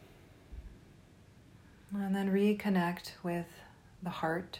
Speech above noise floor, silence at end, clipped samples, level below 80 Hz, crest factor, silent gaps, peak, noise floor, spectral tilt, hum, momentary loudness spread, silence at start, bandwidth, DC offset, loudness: 26 dB; 0 s; under 0.1%; -60 dBFS; 16 dB; none; -20 dBFS; -59 dBFS; -7 dB/octave; none; 23 LU; 0 s; 16 kHz; under 0.1%; -34 LUFS